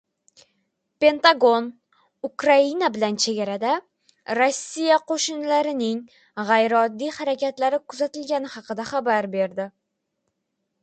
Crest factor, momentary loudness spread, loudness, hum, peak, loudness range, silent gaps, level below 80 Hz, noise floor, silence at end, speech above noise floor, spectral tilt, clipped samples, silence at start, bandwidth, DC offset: 22 dB; 14 LU; -22 LUFS; none; -2 dBFS; 5 LU; none; -74 dBFS; -77 dBFS; 1.15 s; 56 dB; -3 dB/octave; under 0.1%; 1 s; 9.2 kHz; under 0.1%